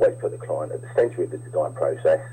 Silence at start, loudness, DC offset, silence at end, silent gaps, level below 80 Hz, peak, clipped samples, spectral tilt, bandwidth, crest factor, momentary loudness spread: 0 s; -25 LUFS; under 0.1%; 0 s; none; -62 dBFS; -10 dBFS; under 0.1%; -7.5 dB/octave; 9.2 kHz; 14 dB; 7 LU